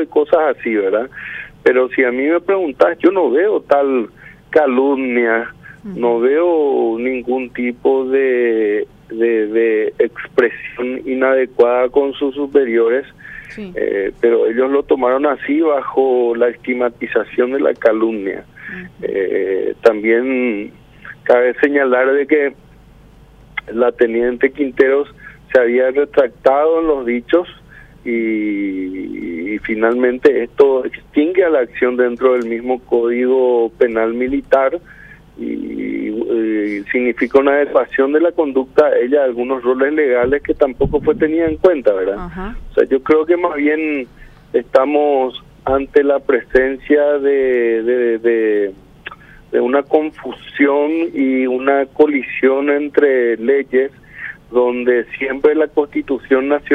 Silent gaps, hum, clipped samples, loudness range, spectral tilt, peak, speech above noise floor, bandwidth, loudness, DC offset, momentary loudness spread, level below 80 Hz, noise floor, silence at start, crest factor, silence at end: none; none; under 0.1%; 3 LU; -7.5 dB/octave; 0 dBFS; 28 dB; 5.4 kHz; -15 LUFS; under 0.1%; 10 LU; -44 dBFS; -43 dBFS; 0 s; 14 dB; 0 s